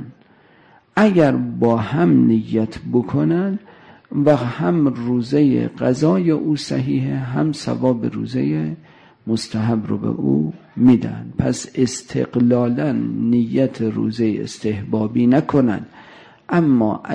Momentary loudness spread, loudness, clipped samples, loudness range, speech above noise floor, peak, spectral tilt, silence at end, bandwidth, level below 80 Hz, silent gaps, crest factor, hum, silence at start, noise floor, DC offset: 9 LU; -18 LUFS; under 0.1%; 4 LU; 34 dB; -4 dBFS; -7.5 dB/octave; 0 s; 10 kHz; -52 dBFS; none; 14 dB; none; 0 s; -51 dBFS; under 0.1%